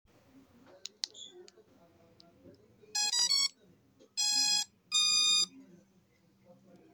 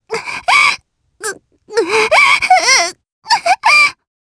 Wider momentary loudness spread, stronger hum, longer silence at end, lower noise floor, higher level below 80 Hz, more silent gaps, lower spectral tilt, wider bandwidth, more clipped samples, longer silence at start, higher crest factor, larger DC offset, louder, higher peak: first, 22 LU vs 16 LU; neither; first, 1.3 s vs 0.35 s; first, -68 dBFS vs -36 dBFS; second, -82 dBFS vs -54 dBFS; second, none vs 3.12-3.22 s; second, 2.5 dB/octave vs 0.5 dB/octave; first, over 20 kHz vs 11 kHz; neither; first, 1.05 s vs 0.1 s; first, 24 dB vs 14 dB; neither; second, -29 LUFS vs -11 LUFS; second, -12 dBFS vs 0 dBFS